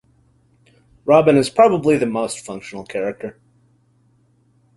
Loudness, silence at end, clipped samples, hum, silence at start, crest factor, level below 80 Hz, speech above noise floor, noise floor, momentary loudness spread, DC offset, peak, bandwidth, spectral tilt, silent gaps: -17 LUFS; 1.45 s; under 0.1%; none; 1.05 s; 18 dB; -56 dBFS; 42 dB; -58 dBFS; 18 LU; under 0.1%; -2 dBFS; 11.5 kHz; -6 dB/octave; none